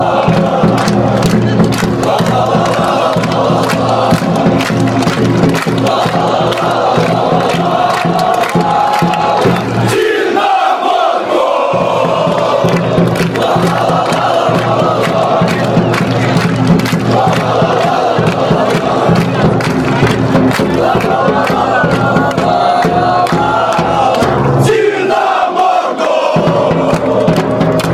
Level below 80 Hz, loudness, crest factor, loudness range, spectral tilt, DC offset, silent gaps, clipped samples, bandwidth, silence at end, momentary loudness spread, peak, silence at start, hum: -38 dBFS; -11 LUFS; 10 dB; 1 LU; -6 dB/octave; under 0.1%; none; under 0.1%; 15 kHz; 0 s; 1 LU; 0 dBFS; 0 s; none